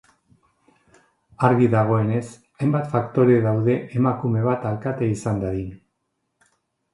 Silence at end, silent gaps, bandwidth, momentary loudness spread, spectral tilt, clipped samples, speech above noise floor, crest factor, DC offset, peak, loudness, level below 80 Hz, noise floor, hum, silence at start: 1.15 s; none; 11.5 kHz; 10 LU; -9 dB/octave; under 0.1%; 55 dB; 22 dB; under 0.1%; -2 dBFS; -21 LUFS; -52 dBFS; -75 dBFS; none; 1.4 s